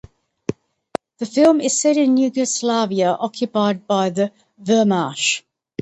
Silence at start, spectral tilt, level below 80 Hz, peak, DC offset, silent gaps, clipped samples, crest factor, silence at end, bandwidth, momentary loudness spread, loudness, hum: 0.5 s; -4 dB/octave; -60 dBFS; -2 dBFS; under 0.1%; none; under 0.1%; 16 dB; 0.4 s; 10.5 kHz; 15 LU; -18 LUFS; none